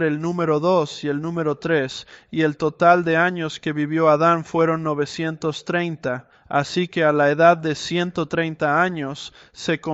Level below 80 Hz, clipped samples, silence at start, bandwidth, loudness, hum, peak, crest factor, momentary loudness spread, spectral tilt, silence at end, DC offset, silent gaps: -60 dBFS; under 0.1%; 0 s; 8.2 kHz; -21 LUFS; none; -2 dBFS; 18 dB; 12 LU; -6 dB/octave; 0 s; under 0.1%; none